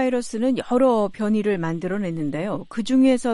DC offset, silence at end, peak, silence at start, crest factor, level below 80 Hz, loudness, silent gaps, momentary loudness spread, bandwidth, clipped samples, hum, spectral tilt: under 0.1%; 0 s; -8 dBFS; 0 s; 14 dB; -54 dBFS; -22 LUFS; none; 8 LU; 11.5 kHz; under 0.1%; none; -6.5 dB/octave